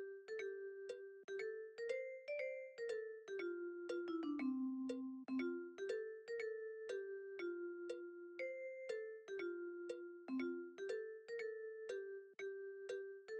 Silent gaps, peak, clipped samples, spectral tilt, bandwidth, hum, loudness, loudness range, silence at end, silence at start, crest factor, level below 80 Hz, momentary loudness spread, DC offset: 1.24-1.28 s; -32 dBFS; under 0.1%; -4 dB/octave; 9.2 kHz; none; -48 LUFS; 3 LU; 0 s; 0 s; 16 dB; under -90 dBFS; 7 LU; under 0.1%